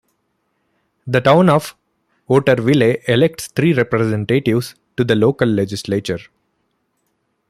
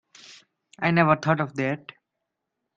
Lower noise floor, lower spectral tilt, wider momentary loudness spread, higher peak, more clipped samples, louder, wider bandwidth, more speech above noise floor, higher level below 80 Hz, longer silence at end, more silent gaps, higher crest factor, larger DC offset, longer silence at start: second, -68 dBFS vs -82 dBFS; about the same, -6.5 dB/octave vs -7 dB/octave; about the same, 9 LU vs 9 LU; first, 0 dBFS vs -4 dBFS; neither; first, -16 LUFS vs -23 LUFS; first, 15.5 kHz vs 7.6 kHz; second, 53 dB vs 59 dB; first, -54 dBFS vs -64 dBFS; first, 1.25 s vs 1 s; neither; second, 16 dB vs 24 dB; neither; first, 1.05 s vs 0.3 s